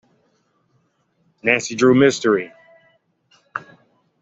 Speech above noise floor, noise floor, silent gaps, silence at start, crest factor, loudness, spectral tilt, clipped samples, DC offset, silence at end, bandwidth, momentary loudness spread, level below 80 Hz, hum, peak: 49 dB; -65 dBFS; none; 1.45 s; 20 dB; -17 LUFS; -5 dB/octave; under 0.1%; under 0.1%; 0.6 s; 8 kHz; 19 LU; -62 dBFS; none; -2 dBFS